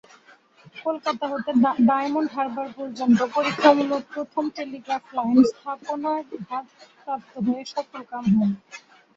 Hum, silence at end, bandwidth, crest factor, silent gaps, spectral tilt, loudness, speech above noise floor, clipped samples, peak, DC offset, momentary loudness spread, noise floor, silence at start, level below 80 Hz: none; 0.4 s; 7.6 kHz; 22 dB; none; -6.5 dB/octave; -23 LUFS; 31 dB; under 0.1%; -2 dBFS; under 0.1%; 15 LU; -54 dBFS; 0.75 s; -66 dBFS